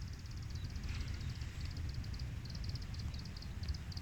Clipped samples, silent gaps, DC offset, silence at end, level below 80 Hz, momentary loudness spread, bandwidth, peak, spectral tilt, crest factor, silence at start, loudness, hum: under 0.1%; none; under 0.1%; 0 s; -46 dBFS; 3 LU; 19 kHz; -30 dBFS; -5 dB/octave; 14 dB; 0 s; -45 LUFS; none